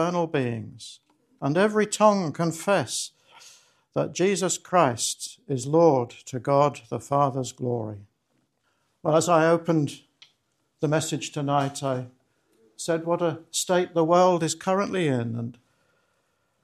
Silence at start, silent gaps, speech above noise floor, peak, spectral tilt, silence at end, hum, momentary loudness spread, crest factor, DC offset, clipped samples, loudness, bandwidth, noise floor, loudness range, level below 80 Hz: 0 s; none; 48 dB; -4 dBFS; -5 dB/octave; 1.1 s; none; 14 LU; 20 dB; under 0.1%; under 0.1%; -24 LUFS; 13 kHz; -72 dBFS; 4 LU; -70 dBFS